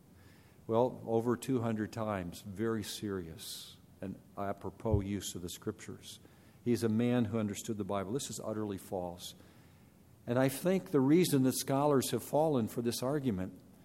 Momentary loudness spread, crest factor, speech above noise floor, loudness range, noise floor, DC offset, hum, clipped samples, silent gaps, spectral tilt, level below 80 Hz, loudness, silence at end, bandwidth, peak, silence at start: 16 LU; 18 dB; 27 dB; 8 LU; -61 dBFS; under 0.1%; none; under 0.1%; none; -6 dB/octave; -58 dBFS; -34 LUFS; 0.25 s; 16 kHz; -16 dBFS; 0.25 s